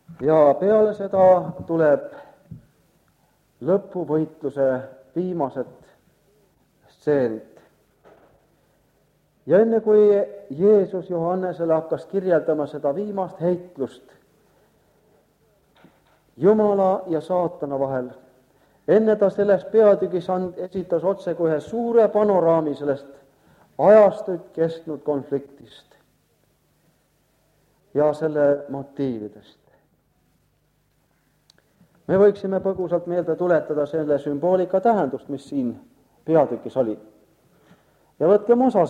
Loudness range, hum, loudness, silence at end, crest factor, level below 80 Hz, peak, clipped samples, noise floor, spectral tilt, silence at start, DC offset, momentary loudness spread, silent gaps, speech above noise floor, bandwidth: 10 LU; none; -21 LUFS; 0 s; 20 dB; -64 dBFS; -2 dBFS; under 0.1%; -65 dBFS; -9 dB/octave; 0.1 s; under 0.1%; 13 LU; none; 45 dB; 8.8 kHz